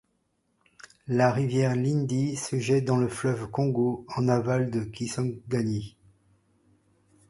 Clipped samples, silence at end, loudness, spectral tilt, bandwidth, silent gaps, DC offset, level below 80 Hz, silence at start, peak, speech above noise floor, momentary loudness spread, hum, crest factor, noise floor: under 0.1%; 1.4 s; -27 LUFS; -6.5 dB/octave; 11.5 kHz; none; under 0.1%; -60 dBFS; 1.05 s; -8 dBFS; 47 dB; 7 LU; none; 20 dB; -73 dBFS